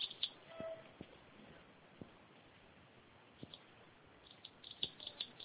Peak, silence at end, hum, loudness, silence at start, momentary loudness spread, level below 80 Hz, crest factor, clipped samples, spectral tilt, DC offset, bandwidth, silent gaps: -22 dBFS; 0 s; none; -48 LUFS; 0 s; 20 LU; -78 dBFS; 28 dB; under 0.1%; -1 dB/octave; under 0.1%; 4 kHz; none